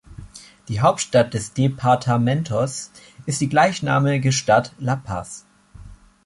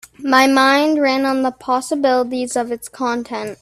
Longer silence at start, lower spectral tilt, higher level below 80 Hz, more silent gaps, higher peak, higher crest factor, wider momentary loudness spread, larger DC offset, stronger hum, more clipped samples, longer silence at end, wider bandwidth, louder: about the same, 0.1 s vs 0.2 s; first, -5.5 dB/octave vs -2.5 dB/octave; first, -48 dBFS vs -60 dBFS; neither; about the same, -2 dBFS vs 0 dBFS; about the same, 18 dB vs 16 dB; first, 19 LU vs 11 LU; neither; neither; neither; first, 0.3 s vs 0.1 s; second, 11.5 kHz vs 14.5 kHz; second, -20 LUFS vs -17 LUFS